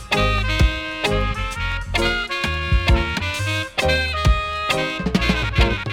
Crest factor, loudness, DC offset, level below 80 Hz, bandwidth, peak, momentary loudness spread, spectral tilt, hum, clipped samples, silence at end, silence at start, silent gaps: 16 dB; -20 LUFS; under 0.1%; -24 dBFS; 16 kHz; -4 dBFS; 4 LU; -5 dB/octave; none; under 0.1%; 0 s; 0 s; none